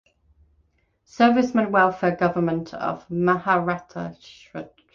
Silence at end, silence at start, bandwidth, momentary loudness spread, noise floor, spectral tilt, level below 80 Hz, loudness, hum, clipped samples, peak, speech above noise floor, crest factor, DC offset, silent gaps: 0.3 s; 1.2 s; 7.2 kHz; 18 LU; -65 dBFS; -7 dB/octave; -58 dBFS; -22 LUFS; none; under 0.1%; -4 dBFS; 43 dB; 18 dB; under 0.1%; none